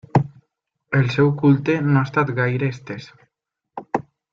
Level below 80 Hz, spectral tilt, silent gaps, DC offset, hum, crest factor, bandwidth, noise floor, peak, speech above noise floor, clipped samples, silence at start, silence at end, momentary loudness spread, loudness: -56 dBFS; -8.5 dB/octave; none; under 0.1%; none; 18 dB; 6.8 kHz; -78 dBFS; -4 dBFS; 60 dB; under 0.1%; 0.15 s; 0.3 s; 17 LU; -20 LUFS